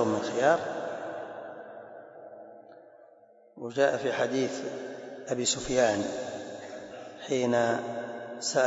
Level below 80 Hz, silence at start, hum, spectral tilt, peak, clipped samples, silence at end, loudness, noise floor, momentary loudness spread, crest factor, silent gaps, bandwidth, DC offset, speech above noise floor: -64 dBFS; 0 s; none; -3.5 dB/octave; -10 dBFS; under 0.1%; 0 s; -30 LUFS; -58 dBFS; 21 LU; 20 dB; none; 8 kHz; under 0.1%; 30 dB